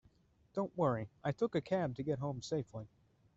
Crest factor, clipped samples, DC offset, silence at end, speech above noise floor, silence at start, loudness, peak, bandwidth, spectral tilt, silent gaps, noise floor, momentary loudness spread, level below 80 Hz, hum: 18 dB; under 0.1%; under 0.1%; 0.5 s; 32 dB; 0.55 s; -38 LUFS; -20 dBFS; 8 kHz; -6.5 dB/octave; none; -69 dBFS; 11 LU; -68 dBFS; none